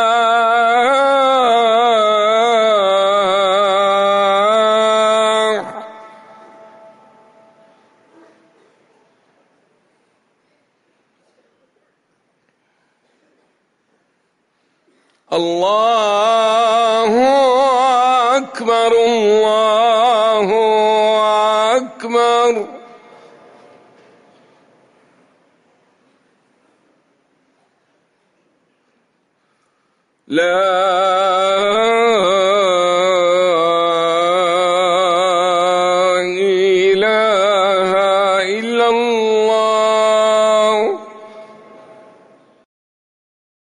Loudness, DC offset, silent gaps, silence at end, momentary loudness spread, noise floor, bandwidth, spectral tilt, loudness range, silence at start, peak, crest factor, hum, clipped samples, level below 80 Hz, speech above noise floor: -13 LUFS; under 0.1%; none; 2.2 s; 4 LU; -64 dBFS; 11 kHz; -3 dB/octave; 8 LU; 0 s; -4 dBFS; 12 dB; none; under 0.1%; -64 dBFS; 50 dB